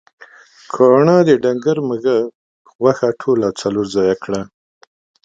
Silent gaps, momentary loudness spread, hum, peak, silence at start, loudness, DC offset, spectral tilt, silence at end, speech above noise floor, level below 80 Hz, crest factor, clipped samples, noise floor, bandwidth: 2.35-2.65 s, 2.75-2.79 s; 13 LU; none; 0 dBFS; 0.75 s; -15 LUFS; under 0.1%; -6.5 dB/octave; 0.75 s; 29 dB; -56 dBFS; 16 dB; under 0.1%; -43 dBFS; 9 kHz